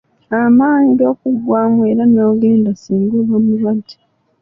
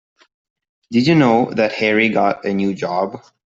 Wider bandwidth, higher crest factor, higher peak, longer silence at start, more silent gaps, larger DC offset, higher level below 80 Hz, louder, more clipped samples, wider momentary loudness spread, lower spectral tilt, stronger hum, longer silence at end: second, 6.2 kHz vs 7.8 kHz; second, 10 dB vs 16 dB; about the same, -2 dBFS vs -2 dBFS; second, 0.3 s vs 0.9 s; neither; neither; about the same, -54 dBFS vs -58 dBFS; first, -13 LUFS vs -17 LUFS; neither; about the same, 7 LU vs 8 LU; first, -9 dB/octave vs -6.5 dB/octave; neither; first, 0.5 s vs 0.3 s